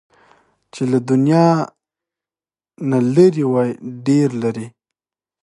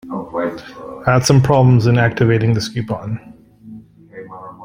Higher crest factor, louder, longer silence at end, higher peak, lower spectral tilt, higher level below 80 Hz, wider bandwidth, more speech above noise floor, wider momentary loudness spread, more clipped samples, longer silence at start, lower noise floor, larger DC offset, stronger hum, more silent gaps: about the same, 18 dB vs 16 dB; about the same, -16 LUFS vs -15 LUFS; first, 0.75 s vs 0 s; about the same, 0 dBFS vs 0 dBFS; first, -8 dB/octave vs -6.5 dB/octave; second, -64 dBFS vs -44 dBFS; second, 11 kHz vs 15.5 kHz; first, over 74 dB vs 24 dB; second, 13 LU vs 21 LU; neither; first, 0.75 s vs 0.05 s; first, under -90 dBFS vs -38 dBFS; neither; neither; neither